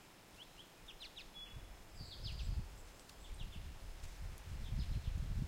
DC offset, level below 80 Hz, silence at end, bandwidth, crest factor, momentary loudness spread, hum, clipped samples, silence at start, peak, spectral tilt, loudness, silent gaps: under 0.1%; -48 dBFS; 0 s; 16 kHz; 18 dB; 13 LU; none; under 0.1%; 0 s; -28 dBFS; -5 dB/octave; -50 LUFS; none